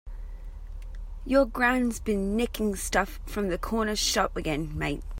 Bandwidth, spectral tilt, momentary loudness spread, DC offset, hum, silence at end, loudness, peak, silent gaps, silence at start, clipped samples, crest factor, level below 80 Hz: 16 kHz; -4 dB/octave; 20 LU; under 0.1%; none; 0 s; -27 LUFS; -8 dBFS; none; 0.05 s; under 0.1%; 20 dB; -38 dBFS